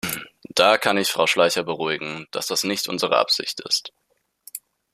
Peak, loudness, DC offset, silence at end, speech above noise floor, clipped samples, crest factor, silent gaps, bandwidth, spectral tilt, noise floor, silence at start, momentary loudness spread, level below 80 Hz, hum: -2 dBFS; -21 LUFS; under 0.1%; 0.35 s; 48 dB; under 0.1%; 22 dB; none; 15.5 kHz; -2 dB/octave; -70 dBFS; 0.05 s; 19 LU; -64 dBFS; none